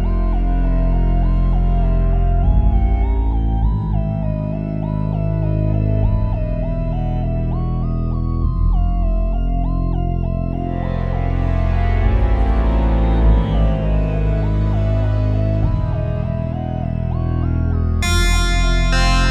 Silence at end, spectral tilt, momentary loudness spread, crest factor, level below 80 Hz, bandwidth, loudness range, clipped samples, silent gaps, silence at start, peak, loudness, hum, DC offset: 0 s; -6.5 dB/octave; 5 LU; 12 dB; -18 dBFS; 10.5 kHz; 3 LU; under 0.1%; none; 0 s; -4 dBFS; -19 LUFS; none; under 0.1%